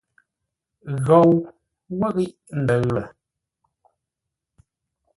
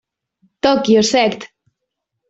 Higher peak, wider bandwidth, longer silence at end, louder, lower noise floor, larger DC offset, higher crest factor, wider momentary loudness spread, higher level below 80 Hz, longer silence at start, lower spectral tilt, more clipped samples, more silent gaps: about the same, -2 dBFS vs -2 dBFS; first, 11.5 kHz vs 8 kHz; first, 2.1 s vs 0.85 s; second, -20 LUFS vs -15 LUFS; first, -84 dBFS vs -77 dBFS; neither; about the same, 20 dB vs 16 dB; first, 22 LU vs 7 LU; about the same, -56 dBFS vs -54 dBFS; first, 0.85 s vs 0.65 s; first, -8.5 dB/octave vs -4 dB/octave; neither; neither